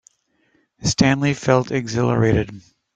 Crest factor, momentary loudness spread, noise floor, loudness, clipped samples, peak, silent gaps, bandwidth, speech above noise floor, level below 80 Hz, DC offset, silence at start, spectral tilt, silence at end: 18 dB; 6 LU; -64 dBFS; -19 LUFS; under 0.1%; -2 dBFS; none; 9.4 kHz; 46 dB; -46 dBFS; under 0.1%; 0.8 s; -5.5 dB/octave; 0.35 s